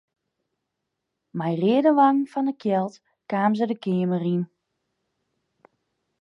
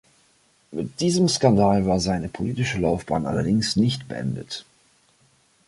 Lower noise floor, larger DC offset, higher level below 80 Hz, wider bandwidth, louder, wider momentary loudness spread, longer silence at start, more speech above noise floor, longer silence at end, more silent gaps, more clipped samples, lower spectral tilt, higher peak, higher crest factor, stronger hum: first, -81 dBFS vs -61 dBFS; neither; second, -78 dBFS vs -46 dBFS; second, 7.2 kHz vs 11.5 kHz; about the same, -23 LUFS vs -22 LUFS; about the same, 12 LU vs 14 LU; first, 1.35 s vs 0.7 s; first, 59 dB vs 39 dB; first, 1.75 s vs 1.05 s; neither; neither; first, -8.5 dB/octave vs -5.5 dB/octave; about the same, -6 dBFS vs -4 dBFS; about the same, 18 dB vs 20 dB; neither